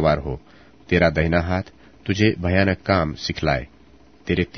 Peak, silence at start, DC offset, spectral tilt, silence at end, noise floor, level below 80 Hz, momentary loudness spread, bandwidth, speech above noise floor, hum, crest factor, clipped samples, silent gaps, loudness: -2 dBFS; 0 s; 0.2%; -6.5 dB/octave; 0 s; -51 dBFS; -38 dBFS; 16 LU; 6.6 kHz; 31 dB; none; 20 dB; under 0.1%; none; -21 LUFS